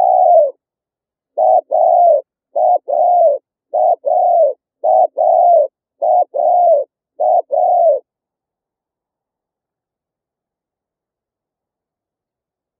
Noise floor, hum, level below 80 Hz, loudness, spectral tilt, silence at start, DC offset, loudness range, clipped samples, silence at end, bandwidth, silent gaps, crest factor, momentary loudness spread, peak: -87 dBFS; none; under -90 dBFS; -13 LUFS; -7 dB/octave; 0 s; under 0.1%; 5 LU; under 0.1%; 4.8 s; 1.1 kHz; none; 14 dB; 10 LU; -2 dBFS